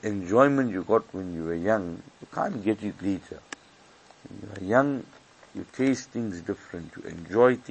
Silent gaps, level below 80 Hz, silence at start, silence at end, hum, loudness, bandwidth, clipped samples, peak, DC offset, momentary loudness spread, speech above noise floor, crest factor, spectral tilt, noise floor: none; -62 dBFS; 0 s; 0 s; none; -27 LUFS; 8.6 kHz; under 0.1%; -4 dBFS; under 0.1%; 20 LU; 29 dB; 22 dB; -6.5 dB/octave; -55 dBFS